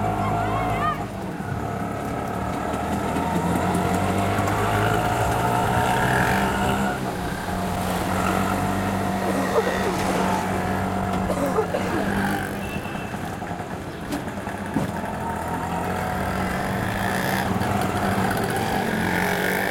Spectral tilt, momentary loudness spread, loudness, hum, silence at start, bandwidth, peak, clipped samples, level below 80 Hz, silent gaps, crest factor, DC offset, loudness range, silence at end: -5.5 dB/octave; 8 LU; -24 LUFS; none; 0 s; 17 kHz; -8 dBFS; under 0.1%; -40 dBFS; none; 16 dB; under 0.1%; 6 LU; 0 s